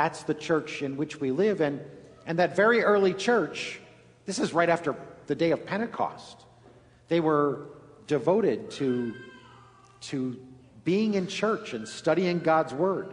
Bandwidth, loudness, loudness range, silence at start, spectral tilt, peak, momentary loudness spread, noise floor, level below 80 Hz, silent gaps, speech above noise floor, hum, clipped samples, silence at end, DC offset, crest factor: 10.5 kHz; -27 LUFS; 5 LU; 0 s; -5.5 dB/octave; -10 dBFS; 18 LU; -55 dBFS; -68 dBFS; none; 29 dB; none; under 0.1%; 0 s; under 0.1%; 18 dB